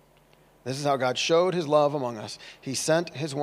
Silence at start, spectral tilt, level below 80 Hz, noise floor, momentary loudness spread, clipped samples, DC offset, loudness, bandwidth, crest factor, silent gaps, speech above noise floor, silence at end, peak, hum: 0.65 s; -4 dB/octave; -70 dBFS; -59 dBFS; 15 LU; under 0.1%; under 0.1%; -25 LUFS; 15.5 kHz; 18 dB; none; 33 dB; 0 s; -8 dBFS; none